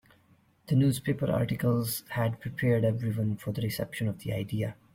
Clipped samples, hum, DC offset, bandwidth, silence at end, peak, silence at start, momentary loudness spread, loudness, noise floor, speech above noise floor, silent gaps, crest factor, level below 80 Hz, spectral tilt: under 0.1%; none; under 0.1%; 16.5 kHz; 0.2 s; -14 dBFS; 0.7 s; 7 LU; -30 LUFS; -64 dBFS; 35 dB; none; 14 dB; -58 dBFS; -6.5 dB/octave